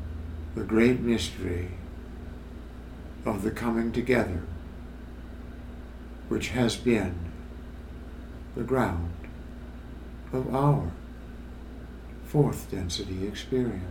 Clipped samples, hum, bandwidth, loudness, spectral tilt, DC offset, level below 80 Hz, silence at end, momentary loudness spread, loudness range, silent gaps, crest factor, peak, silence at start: under 0.1%; none; 17.5 kHz; -29 LUFS; -6.5 dB/octave; under 0.1%; -42 dBFS; 0 s; 18 LU; 3 LU; none; 22 dB; -8 dBFS; 0 s